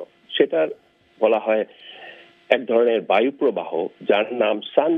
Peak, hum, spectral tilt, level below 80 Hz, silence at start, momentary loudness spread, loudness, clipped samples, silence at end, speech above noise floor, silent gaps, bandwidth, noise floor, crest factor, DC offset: 0 dBFS; none; -7 dB/octave; -76 dBFS; 0 s; 18 LU; -21 LUFS; under 0.1%; 0 s; 24 dB; none; 4.7 kHz; -44 dBFS; 20 dB; under 0.1%